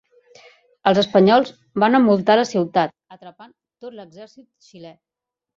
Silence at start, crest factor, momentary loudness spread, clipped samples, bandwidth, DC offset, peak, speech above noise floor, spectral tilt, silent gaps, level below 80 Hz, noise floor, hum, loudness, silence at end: 0.85 s; 18 dB; 24 LU; under 0.1%; 7.6 kHz; under 0.1%; -2 dBFS; 68 dB; -6 dB/octave; none; -64 dBFS; -86 dBFS; none; -17 LUFS; 0.65 s